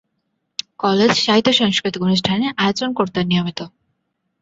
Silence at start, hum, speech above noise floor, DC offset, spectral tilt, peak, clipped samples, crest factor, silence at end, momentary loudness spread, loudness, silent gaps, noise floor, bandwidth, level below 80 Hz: 0.8 s; none; 55 dB; under 0.1%; -5 dB/octave; -2 dBFS; under 0.1%; 18 dB; 0.75 s; 16 LU; -17 LUFS; none; -72 dBFS; 7.8 kHz; -54 dBFS